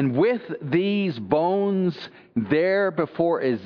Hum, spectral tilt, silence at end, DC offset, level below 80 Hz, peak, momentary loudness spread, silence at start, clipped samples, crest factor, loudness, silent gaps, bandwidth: none; -9 dB/octave; 0 s; under 0.1%; -64 dBFS; -6 dBFS; 7 LU; 0 s; under 0.1%; 16 dB; -23 LUFS; none; 5.4 kHz